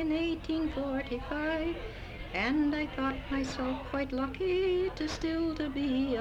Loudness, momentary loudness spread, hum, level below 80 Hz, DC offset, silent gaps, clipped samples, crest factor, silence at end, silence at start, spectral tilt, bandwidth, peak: -33 LUFS; 6 LU; none; -46 dBFS; under 0.1%; none; under 0.1%; 12 dB; 0 s; 0 s; -6 dB/octave; 10 kHz; -20 dBFS